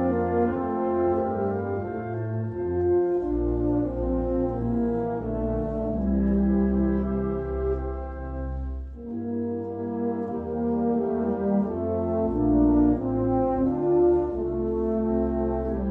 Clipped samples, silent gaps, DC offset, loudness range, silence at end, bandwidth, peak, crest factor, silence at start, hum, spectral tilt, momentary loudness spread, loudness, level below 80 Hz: under 0.1%; none; under 0.1%; 6 LU; 0 s; 3.2 kHz; -10 dBFS; 14 dB; 0 s; none; -12 dB/octave; 9 LU; -26 LUFS; -36 dBFS